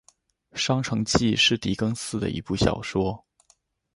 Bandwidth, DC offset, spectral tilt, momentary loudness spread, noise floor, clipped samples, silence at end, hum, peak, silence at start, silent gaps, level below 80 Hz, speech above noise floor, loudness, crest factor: 11.5 kHz; under 0.1%; -4.5 dB/octave; 9 LU; -65 dBFS; under 0.1%; 0.8 s; none; -4 dBFS; 0.55 s; none; -44 dBFS; 40 dB; -24 LUFS; 22 dB